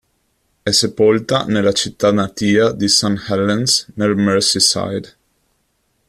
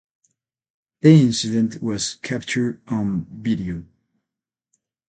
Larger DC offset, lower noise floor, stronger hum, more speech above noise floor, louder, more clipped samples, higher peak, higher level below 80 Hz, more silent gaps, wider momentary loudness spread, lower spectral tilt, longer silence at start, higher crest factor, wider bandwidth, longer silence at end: neither; second, -65 dBFS vs -87 dBFS; neither; second, 49 dB vs 67 dB; first, -15 LUFS vs -20 LUFS; neither; about the same, 0 dBFS vs 0 dBFS; about the same, -52 dBFS vs -52 dBFS; neither; second, 6 LU vs 12 LU; second, -3.5 dB/octave vs -6 dB/octave; second, 0.65 s vs 1.05 s; second, 16 dB vs 22 dB; first, 14.5 kHz vs 9.2 kHz; second, 1.05 s vs 1.25 s